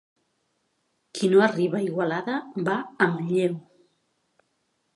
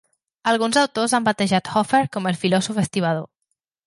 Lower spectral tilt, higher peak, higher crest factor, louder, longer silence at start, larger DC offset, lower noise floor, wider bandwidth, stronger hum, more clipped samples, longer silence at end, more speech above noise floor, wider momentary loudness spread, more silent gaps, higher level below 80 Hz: first, -6.5 dB/octave vs -4.5 dB/octave; about the same, -4 dBFS vs -6 dBFS; first, 22 dB vs 16 dB; second, -24 LUFS vs -20 LUFS; first, 1.15 s vs 0.45 s; neither; second, -73 dBFS vs -77 dBFS; about the same, 11.5 kHz vs 11.5 kHz; neither; neither; first, 1.35 s vs 0.6 s; second, 50 dB vs 57 dB; first, 10 LU vs 5 LU; neither; second, -76 dBFS vs -62 dBFS